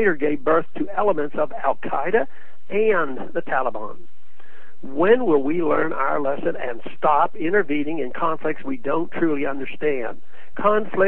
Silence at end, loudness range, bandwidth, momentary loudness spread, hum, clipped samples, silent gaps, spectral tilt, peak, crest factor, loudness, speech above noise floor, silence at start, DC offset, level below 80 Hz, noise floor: 0 s; 3 LU; 4.1 kHz; 9 LU; none; under 0.1%; none; -9.5 dB/octave; -4 dBFS; 18 dB; -22 LUFS; 31 dB; 0 s; 8%; -62 dBFS; -53 dBFS